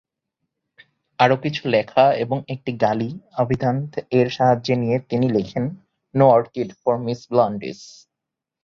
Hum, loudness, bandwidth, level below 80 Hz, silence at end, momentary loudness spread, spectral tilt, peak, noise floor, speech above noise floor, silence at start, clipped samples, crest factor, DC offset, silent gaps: none; -20 LUFS; 7.4 kHz; -56 dBFS; 0.75 s; 11 LU; -7.5 dB/octave; -2 dBFS; -84 dBFS; 65 dB; 1.2 s; under 0.1%; 18 dB; under 0.1%; none